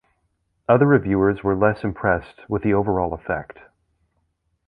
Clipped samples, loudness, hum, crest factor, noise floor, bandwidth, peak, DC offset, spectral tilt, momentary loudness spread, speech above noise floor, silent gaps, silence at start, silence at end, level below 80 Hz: under 0.1%; -20 LUFS; none; 20 dB; -70 dBFS; 4.9 kHz; -2 dBFS; under 0.1%; -11 dB/octave; 12 LU; 50 dB; none; 0.7 s; 1.25 s; -44 dBFS